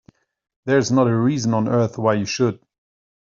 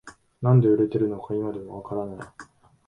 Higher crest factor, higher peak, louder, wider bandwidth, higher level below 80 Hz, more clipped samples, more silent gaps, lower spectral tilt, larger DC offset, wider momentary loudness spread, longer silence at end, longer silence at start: about the same, 18 dB vs 18 dB; first, -4 dBFS vs -8 dBFS; first, -19 LUFS vs -24 LUFS; about the same, 7.6 kHz vs 7.4 kHz; about the same, -60 dBFS vs -60 dBFS; neither; neither; second, -6 dB/octave vs -10.5 dB/octave; neither; second, 6 LU vs 18 LU; first, 0.8 s vs 0.45 s; first, 0.65 s vs 0.05 s